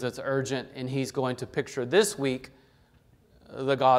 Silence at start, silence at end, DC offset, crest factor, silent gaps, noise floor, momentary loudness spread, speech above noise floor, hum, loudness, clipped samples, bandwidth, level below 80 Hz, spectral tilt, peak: 0 s; 0 s; under 0.1%; 20 dB; none; -61 dBFS; 9 LU; 34 dB; none; -29 LUFS; under 0.1%; 15.5 kHz; -64 dBFS; -4.5 dB/octave; -8 dBFS